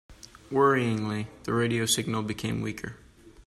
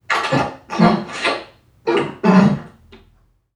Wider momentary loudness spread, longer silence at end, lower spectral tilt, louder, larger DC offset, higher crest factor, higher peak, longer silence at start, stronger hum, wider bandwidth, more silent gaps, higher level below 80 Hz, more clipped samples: about the same, 11 LU vs 12 LU; second, 0.05 s vs 0.85 s; second, -4.5 dB/octave vs -6.5 dB/octave; second, -27 LUFS vs -18 LUFS; neither; about the same, 18 dB vs 18 dB; second, -10 dBFS vs 0 dBFS; about the same, 0.1 s vs 0.1 s; neither; first, 13.5 kHz vs 11 kHz; neither; second, -56 dBFS vs -50 dBFS; neither